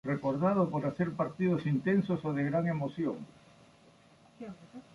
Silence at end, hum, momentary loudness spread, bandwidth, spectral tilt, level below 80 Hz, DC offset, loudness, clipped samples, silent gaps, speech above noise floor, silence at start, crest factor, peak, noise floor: 0.15 s; none; 18 LU; 11 kHz; -9 dB/octave; -68 dBFS; under 0.1%; -31 LUFS; under 0.1%; none; 29 dB; 0.05 s; 18 dB; -16 dBFS; -61 dBFS